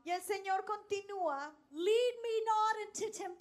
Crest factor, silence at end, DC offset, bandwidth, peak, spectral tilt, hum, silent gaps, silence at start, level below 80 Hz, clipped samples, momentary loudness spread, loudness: 14 dB; 0.05 s; under 0.1%; 14.5 kHz; -22 dBFS; -1.5 dB/octave; none; none; 0.05 s; -84 dBFS; under 0.1%; 9 LU; -36 LUFS